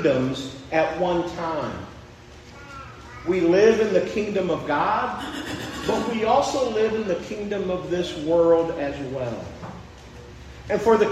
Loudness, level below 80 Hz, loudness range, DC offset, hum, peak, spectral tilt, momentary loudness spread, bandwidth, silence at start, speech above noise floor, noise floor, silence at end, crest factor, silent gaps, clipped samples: -23 LUFS; -48 dBFS; 3 LU; under 0.1%; none; -4 dBFS; -5.5 dB/octave; 22 LU; 13.5 kHz; 0 s; 22 dB; -44 dBFS; 0 s; 18 dB; none; under 0.1%